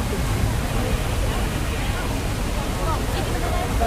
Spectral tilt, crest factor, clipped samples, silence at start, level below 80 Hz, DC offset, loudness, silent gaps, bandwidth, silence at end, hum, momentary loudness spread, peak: -5 dB/octave; 14 dB; under 0.1%; 0 s; -26 dBFS; under 0.1%; -24 LUFS; none; 16 kHz; 0 s; none; 2 LU; -8 dBFS